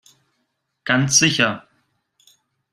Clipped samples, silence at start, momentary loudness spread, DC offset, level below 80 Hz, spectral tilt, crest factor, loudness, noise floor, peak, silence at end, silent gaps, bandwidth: under 0.1%; 0.85 s; 19 LU; under 0.1%; -60 dBFS; -2.5 dB/octave; 22 dB; -16 LUFS; -73 dBFS; -2 dBFS; 1.15 s; none; 14.5 kHz